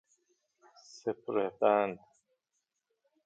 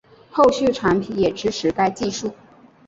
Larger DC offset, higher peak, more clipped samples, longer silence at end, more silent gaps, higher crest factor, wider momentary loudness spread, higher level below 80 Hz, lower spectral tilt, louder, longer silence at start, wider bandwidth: neither; second, -14 dBFS vs -2 dBFS; neither; first, 1.3 s vs 0.55 s; neither; about the same, 22 dB vs 18 dB; about the same, 12 LU vs 11 LU; second, -82 dBFS vs -50 dBFS; about the same, -6 dB/octave vs -5 dB/octave; second, -32 LUFS vs -20 LUFS; first, 0.95 s vs 0.35 s; about the same, 7.8 kHz vs 8 kHz